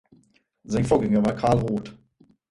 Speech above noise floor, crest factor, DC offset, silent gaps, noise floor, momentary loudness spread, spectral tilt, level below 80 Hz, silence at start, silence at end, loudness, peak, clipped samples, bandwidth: 40 dB; 18 dB; under 0.1%; none; -62 dBFS; 10 LU; -7.5 dB/octave; -46 dBFS; 0.7 s; 0.6 s; -23 LUFS; -6 dBFS; under 0.1%; 11.5 kHz